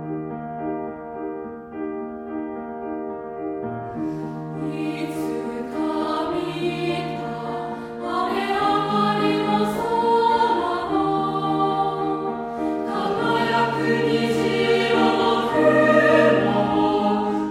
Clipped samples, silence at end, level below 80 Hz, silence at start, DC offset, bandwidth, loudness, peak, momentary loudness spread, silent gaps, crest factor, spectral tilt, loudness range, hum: under 0.1%; 0 s; -54 dBFS; 0 s; under 0.1%; 14.5 kHz; -22 LUFS; -4 dBFS; 13 LU; none; 18 dB; -6 dB/octave; 12 LU; none